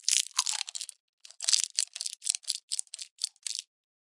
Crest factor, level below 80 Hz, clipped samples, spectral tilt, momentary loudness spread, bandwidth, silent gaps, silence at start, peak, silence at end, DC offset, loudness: 32 dB; under -90 dBFS; under 0.1%; 11 dB/octave; 12 LU; 11.5 kHz; 1.00-1.18 s, 2.63-2.68 s, 3.11-3.16 s; 0.05 s; -2 dBFS; 0.5 s; under 0.1%; -30 LUFS